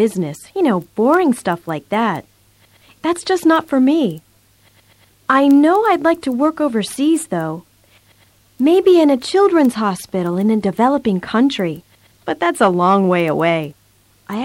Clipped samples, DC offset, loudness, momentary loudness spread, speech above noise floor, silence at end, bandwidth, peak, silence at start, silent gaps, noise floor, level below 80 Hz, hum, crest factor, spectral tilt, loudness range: under 0.1%; under 0.1%; -16 LUFS; 12 LU; 39 dB; 0 s; 16.5 kHz; -2 dBFS; 0 s; none; -54 dBFS; -58 dBFS; none; 14 dB; -6 dB/octave; 4 LU